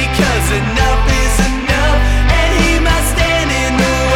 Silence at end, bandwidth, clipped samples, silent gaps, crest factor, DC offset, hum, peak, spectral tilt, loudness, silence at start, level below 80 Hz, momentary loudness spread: 0 s; 17 kHz; under 0.1%; none; 12 dB; under 0.1%; none; 0 dBFS; -4.5 dB/octave; -13 LUFS; 0 s; -16 dBFS; 2 LU